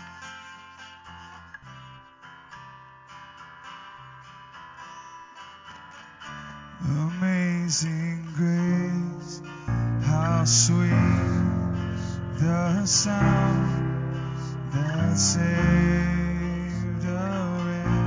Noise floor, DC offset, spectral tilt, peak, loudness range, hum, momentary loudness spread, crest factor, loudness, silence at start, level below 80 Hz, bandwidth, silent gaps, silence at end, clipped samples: -48 dBFS; under 0.1%; -5 dB/octave; -6 dBFS; 22 LU; none; 23 LU; 20 dB; -24 LUFS; 0 s; -40 dBFS; 7.6 kHz; none; 0 s; under 0.1%